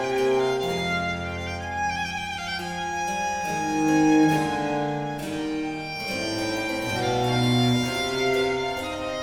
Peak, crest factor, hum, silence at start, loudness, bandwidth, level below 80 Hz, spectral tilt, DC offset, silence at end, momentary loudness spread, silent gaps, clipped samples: -10 dBFS; 14 dB; none; 0 s; -25 LUFS; 17.5 kHz; -50 dBFS; -5 dB/octave; under 0.1%; 0 s; 9 LU; none; under 0.1%